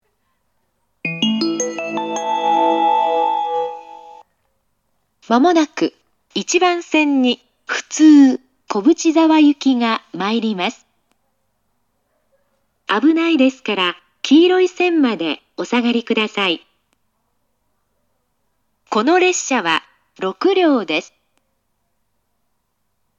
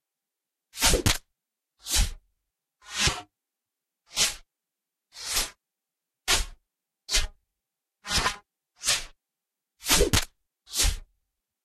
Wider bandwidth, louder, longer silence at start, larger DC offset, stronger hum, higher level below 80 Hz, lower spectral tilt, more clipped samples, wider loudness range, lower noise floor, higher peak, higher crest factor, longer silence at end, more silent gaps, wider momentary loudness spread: second, 8 kHz vs 16 kHz; first, -16 LUFS vs -26 LUFS; first, 1.05 s vs 0.75 s; neither; neither; second, -72 dBFS vs -36 dBFS; first, -3.5 dB/octave vs -1.5 dB/octave; neither; first, 7 LU vs 3 LU; second, -71 dBFS vs -87 dBFS; first, 0 dBFS vs -6 dBFS; second, 18 dB vs 24 dB; first, 2.15 s vs 0.6 s; neither; second, 12 LU vs 19 LU